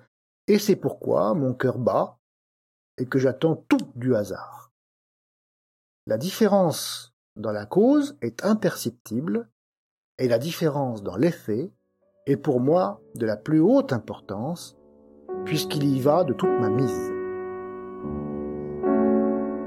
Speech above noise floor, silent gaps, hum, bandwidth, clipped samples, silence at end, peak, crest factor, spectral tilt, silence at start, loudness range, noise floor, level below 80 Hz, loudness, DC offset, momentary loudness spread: 28 dB; 2.19-2.98 s, 4.71-6.07 s, 7.13-7.36 s, 9.00-9.05 s, 9.52-10.18 s; none; 16 kHz; under 0.1%; 0 s; -6 dBFS; 18 dB; -6.5 dB/octave; 0.5 s; 3 LU; -52 dBFS; -60 dBFS; -24 LUFS; under 0.1%; 13 LU